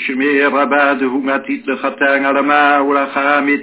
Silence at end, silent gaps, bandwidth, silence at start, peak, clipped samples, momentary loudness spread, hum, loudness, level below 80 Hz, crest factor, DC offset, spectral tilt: 0 s; none; 4 kHz; 0 s; 0 dBFS; under 0.1%; 7 LU; none; -14 LUFS; -68 dBFS; 14 dB; under 0.1%; -7.5 dB/octave